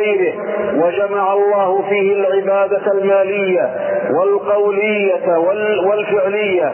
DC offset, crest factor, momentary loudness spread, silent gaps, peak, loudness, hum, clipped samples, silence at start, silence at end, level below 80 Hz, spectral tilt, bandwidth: under 0.1%; 10 dB; 3 LU; none; -4 dBFS; -15 LUFS; none; under 0.1%; 0 s; 0 s; -64 dBFS; -9.5 dB/octave; 3.2 kHz